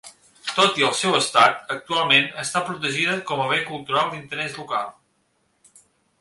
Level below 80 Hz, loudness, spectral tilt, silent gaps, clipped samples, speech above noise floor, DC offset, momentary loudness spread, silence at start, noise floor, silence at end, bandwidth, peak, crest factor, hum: -66 dBFS; -21 LUFS; -2.5 dB/octave; none; under 0.1%; 46 dB; under 0.1%; 12 LU; 0.05 s; -67 dBFS; 1.3 s; 11.5 kHz; -2 dBFS; 22 dB; none